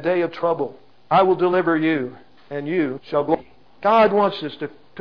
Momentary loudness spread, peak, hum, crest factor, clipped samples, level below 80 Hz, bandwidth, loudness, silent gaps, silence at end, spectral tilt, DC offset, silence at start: 14 LU; -6 dBFS; none; 16 dB; under 0.1%; -60 dBFS; 5.4 kHz; -20 LUFS; none; 0 s; -8 dB/octave; 0.4%; 0 s